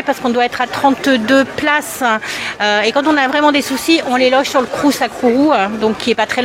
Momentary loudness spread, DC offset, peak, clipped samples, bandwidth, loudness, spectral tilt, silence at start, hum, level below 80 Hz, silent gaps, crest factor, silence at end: 4 LU; under 0.1%; 0 dBFS; under 0.1%; 16.5 kHz; -14 LUFS; -3 dB/octave; 0 s; none; -52 dBFS; none; 14 dB; 0 s